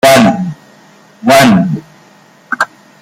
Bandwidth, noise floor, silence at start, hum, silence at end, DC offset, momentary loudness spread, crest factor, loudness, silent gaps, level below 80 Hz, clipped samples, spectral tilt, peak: 17 kHz; -42 dBFS; 0.05 s; none; 0.35 s; under 0.1%; 16 LU; 12 dB; -10 LUFS; none; -46 dBFS; under 0.1%; -5 dB/octave; 0 dBFS